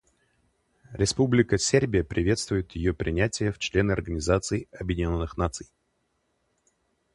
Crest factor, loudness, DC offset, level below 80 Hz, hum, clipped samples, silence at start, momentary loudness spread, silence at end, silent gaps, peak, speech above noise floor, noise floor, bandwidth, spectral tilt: 22 dB; -26 LUFS; under 0.1%; -40 dBFS; none; under 0.1%; 0.9 s; 9 LU; 1.5 s; none; -6 dBFS; 48 dB; -74 dBFS; 11.5 kHz; -5 dB/octave